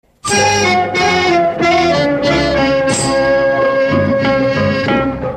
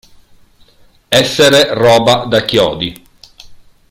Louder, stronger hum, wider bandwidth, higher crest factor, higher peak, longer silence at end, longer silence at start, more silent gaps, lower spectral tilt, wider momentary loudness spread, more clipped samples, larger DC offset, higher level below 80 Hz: second, -13 LUFS vs -10 LUFS; neither; second, 13.5 kHz vs 17 kHz; about the same, 12 dB vs 14 dB; about the same, -2 dBFS vs 0 dBFS; second, 0 s vs 0.35 s; second, 0.25 s vs 1.1 s; neither; about the same, -4 dB/octave vs -3.5 dB/octave; second, 3 LU vs 7 LU; neither; neither; first, -36 dBFS vs -44 dBFS